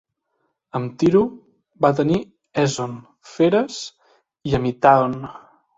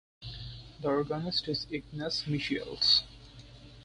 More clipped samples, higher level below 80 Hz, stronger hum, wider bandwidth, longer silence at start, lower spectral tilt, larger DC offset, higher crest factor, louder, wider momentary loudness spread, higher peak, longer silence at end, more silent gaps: neither; about the same, -50 dBFS vs -54 dBFS; neither; second, 8 kHz vs 11.5 kHz; first, 0.75 s vs 0.2 s; first, -6 dB/octave vs -4.5 dB/octave; neither; about the same, 20 dB vs 22 dB; first, -20 LUFS vs -30 LUFS; second, 16 LU vs 20 LU; first, -2 dBFS vs -12 dBFS; first, 0.4 s vs 0 s; neither